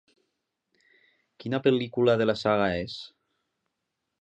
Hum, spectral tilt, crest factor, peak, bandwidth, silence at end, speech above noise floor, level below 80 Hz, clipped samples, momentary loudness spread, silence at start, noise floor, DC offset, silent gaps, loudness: none; -7 dB/octave; 20 dB; -10 dBFS; 8.4 kHz; 1.15 s; 57 dB; -58 dBFS; under 0.1%; 17 LU; 1.45 s; -82 dBFS; under 0.1%; none; -26 LUFS